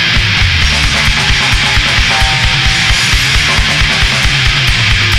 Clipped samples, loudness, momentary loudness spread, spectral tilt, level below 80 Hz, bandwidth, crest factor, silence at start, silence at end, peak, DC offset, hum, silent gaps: under 0.1%; -9 LUFS; 1 LU; -2.5 dB/octave; -18 dBFS; 16.5 kHz; 10 dB; 0 s; 0 s; 0 dBFS; 2%; none; none